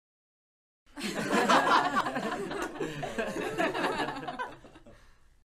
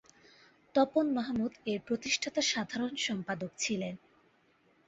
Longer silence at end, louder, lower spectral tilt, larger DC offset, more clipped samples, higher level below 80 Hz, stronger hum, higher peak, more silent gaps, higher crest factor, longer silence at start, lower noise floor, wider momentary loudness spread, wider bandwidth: second, 0.45 s vs 0.9 s; first, -30 LUFS vs -33 LUFS; about the same, -4 dB/octave vs -3.5 dB/octave; neither; neither; first, -58 dBFS vs -70 dBFS; neither; first, -10 dBFS vs -14 dBFS; neither; about the same, 22 dB vs 20 dB; first, 0.95 s vs 0.75 s; second, -57 dBFS vs -69 dBFS; first, 14 LU vs 8 LU; first, 15 kHz vs 8.2 kHz